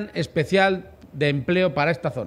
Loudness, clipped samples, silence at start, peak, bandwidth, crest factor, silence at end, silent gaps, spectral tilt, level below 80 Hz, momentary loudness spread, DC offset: -22 LUFS; under 0.1%; 0 s; -6 dBFS; 13 kHz; 16 dB; 0 s; none; -6.5 dB/octave; -52 dBFS; 8 LU; under 0.1%